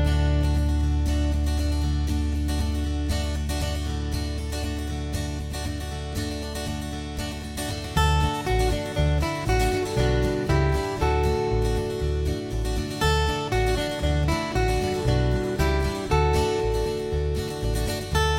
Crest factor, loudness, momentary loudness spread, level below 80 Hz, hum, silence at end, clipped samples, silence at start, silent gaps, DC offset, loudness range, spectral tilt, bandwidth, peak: 16 dB; -25 LUFS; 8 LU; -28 dBFS; none; 0 s; under 0.1%; 0 s; none; under 0.1%; 6 LU; -5.5 dB/octave; 16.5 kHz; -8 dBFS